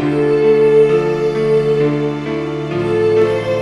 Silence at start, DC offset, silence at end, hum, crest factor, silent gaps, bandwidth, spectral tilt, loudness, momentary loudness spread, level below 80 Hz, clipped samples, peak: 0 s; under 0.1%; 0 s; none; 12 dB; none; 9.4 kHz; -7.5 dB/octave; -14 LUFS; 9 LU; -48 dBFS; under 0.1%; -2 dBFS